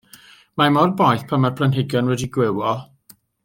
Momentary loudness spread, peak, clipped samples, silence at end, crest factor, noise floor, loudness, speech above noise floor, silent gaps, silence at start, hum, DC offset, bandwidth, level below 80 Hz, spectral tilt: 8 LU; -2 dBFS; under 0.1%; 0.6 s; 18 dB; -52 dBFS; -19 LUFS; 34 dB; none; 0.55 s; none; under 0.1%; 17 kHz; -58 dBFS; -6.5 dB/octave